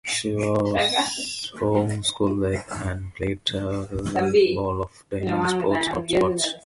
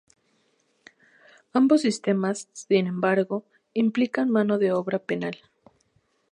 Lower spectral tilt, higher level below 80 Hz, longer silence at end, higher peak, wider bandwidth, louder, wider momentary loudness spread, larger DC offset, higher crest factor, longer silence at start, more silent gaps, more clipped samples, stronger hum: second, -4.5 dB/octave vs -6 dB/octave; first, -44 dBFS vs -76 dBFS; second, 0.05 s vs 0.95 s; about the same, -8 dBFS vs -8 dBFS; about the same, 11.5 kHz vs 11 kHz; about the same, -24 LUFS vs -24 LUFS; second, 9 LU vs 12 LU; neither; about the same, 16 dB vs 18 dB; second, 0.05 s vs 1.55 s; neither; neither; neither